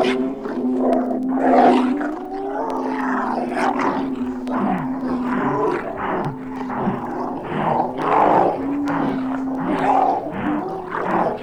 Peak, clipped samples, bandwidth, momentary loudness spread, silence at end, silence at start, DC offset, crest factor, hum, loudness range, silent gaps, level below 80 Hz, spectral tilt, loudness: -4 dBFS; under 0.1%; 10 kHz; 10 LU; 0 s; 0 s; under 0.1%; 18 dB; none; 4 LU; none; -48 dBFS; -7 dB/octave; -21 LUFS